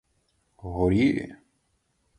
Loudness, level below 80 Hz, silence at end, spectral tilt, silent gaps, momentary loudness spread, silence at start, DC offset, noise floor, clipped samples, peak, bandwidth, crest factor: -25 LUFS; -44 dBFS; 0.85 s; -8 dB/octave; none; 20 LU; 0.65 s; under 0.1%; -72 dBFS; under 0.1%; -10 dBFS; 10.5 kHz; 18 dB